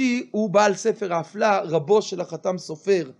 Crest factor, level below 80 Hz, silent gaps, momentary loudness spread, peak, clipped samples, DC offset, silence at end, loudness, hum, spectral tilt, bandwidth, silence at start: 18 dB; -76 dBFS; none; 9 LU; -4 dBFS; under 0.1%; under 0.1%; 0.05 s; -22 LUFS; none; -5 dB/octave; 10.5 kHz; 0 s